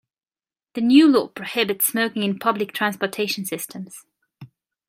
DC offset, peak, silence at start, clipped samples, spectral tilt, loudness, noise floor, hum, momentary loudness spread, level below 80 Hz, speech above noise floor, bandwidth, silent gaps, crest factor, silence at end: under 0.1%; -2 dBFS; 0.75 s; under 0.1%; -3.5 dB/octave; -20 LUFS; under -90 dBFS; none; 17 LU; -70 dBFS; over 70 dB; 16 kHz; none; 20 dB; 0.45 s